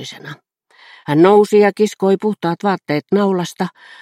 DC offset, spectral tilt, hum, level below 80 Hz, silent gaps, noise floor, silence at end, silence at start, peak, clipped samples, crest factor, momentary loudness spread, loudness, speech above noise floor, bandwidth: under 0.1%; -6.5 dB/octave; none; -66 dBFS; none; -47 dBFS; 0.35 s; 0 s; 0 dBFS; under 0.1%; 16 dB; 19 LU; -15 LUFS; 31 dB; 14 kHz